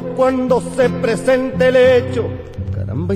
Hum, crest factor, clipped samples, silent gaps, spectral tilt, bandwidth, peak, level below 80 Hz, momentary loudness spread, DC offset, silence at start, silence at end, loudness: none; 14 dB; under 0.1%; none; -6.5 dB/octave; 10.5 kHz; -2 dBFS; -40 dBFS; 13 LU; under 0.1%; 0 s; 0 s; -16 LUFS